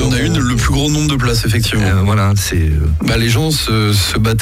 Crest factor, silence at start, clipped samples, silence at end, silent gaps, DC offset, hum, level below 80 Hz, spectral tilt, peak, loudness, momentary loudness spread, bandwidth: 12 dB; 0 s; under 0.1%; 0 s; none; under 0.1%; none; -22 dBFS; -5 dB/octave; -2 dBFS; -14 LUFS; 2 LU; 16 kHz